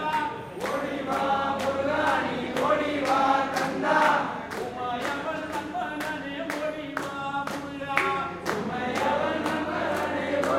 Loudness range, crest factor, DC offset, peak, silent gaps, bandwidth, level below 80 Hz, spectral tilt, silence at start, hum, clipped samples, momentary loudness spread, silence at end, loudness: 6 LU; 22 dB; under 0.1%; -4 dBFS; none; 16.5 kHz; -60 dBFS; -4.5 dB/octave; 0 s; none; under 0.1%; 9 LU; 0 s; -27 LUFS